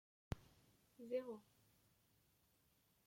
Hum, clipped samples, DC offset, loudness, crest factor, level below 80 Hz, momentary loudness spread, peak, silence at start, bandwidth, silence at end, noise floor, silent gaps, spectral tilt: none; under 0.1%; under 0.1%; -51 LUFS; 24 dB; -70 dBFS; 12 LU; -30 dBFS; 0.3 s; 16.5 kHz; 1.65 s; -79 dBFS; none; -7 dB/octave